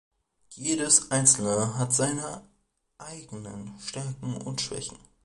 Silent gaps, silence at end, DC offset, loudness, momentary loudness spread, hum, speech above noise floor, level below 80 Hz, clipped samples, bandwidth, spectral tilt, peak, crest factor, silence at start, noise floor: none; 0.3 s; under 0.1%; -25 LUFS; 20 LU; none; 36 dB; -60 dBFS; under 0.1%; 11.5 kHz; -3 dB/octave; -4 dBFS; 24 dB; 0.5 s; -64 dBFS